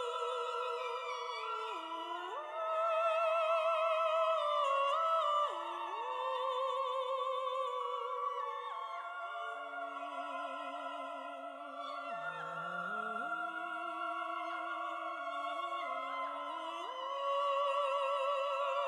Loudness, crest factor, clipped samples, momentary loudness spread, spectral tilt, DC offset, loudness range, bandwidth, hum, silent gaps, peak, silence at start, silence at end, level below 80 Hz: -37 LUFS; 16 dB; under 0.1%; 10 LU; -2.5 dB/octave; under 0.1%; 9 LU; 12.5 kHz; none; none; -22 dBFS; 0 s; 0 s; under -90 dBFS